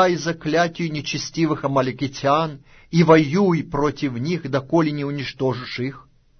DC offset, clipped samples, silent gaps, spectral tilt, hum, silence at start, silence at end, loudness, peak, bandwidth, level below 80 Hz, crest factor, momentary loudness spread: under 0.1%; under 0.1%; none; -6 dB/octave; none; 0 s; 0.4 s; -21 LUFS; -2 dBFS; 6.6 kHz; -50 dBFS; 18 dB; 11 LU